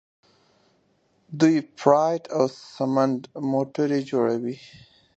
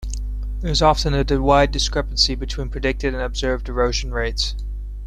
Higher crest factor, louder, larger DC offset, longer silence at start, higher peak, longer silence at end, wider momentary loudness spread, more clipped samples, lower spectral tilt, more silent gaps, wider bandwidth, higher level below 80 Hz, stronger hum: about the same, 22 dB vs 18 dB; second, -23 LUFS vs -20 LUFS; neither; first, 1.3 s vs 0 s; about the same, -2 dBFS vs -2 dBFS; first, 0.6 s vs 0 s; second, 9 LU vs 12 LU; neither; first, -6.5 dB/octave vs -4.5 dB/octave; neither; second, 8.2 kHz vs 10 kHz; second, -70 dBFS vs -26 dBFS; second, none vs 50 Hz at -25 dBFS